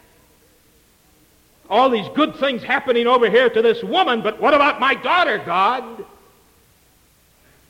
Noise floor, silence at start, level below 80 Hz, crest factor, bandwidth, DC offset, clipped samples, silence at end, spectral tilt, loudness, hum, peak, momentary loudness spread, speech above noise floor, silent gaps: -56 dBFS; 1.7 s; -58 dBFS; 14 dB; 16 kHz; under 0.1%; under 0.1%; 1.65 s; -5 dB/octave; -17 LUFS; none; -6 dBFS; 6 LU; 39 dB; none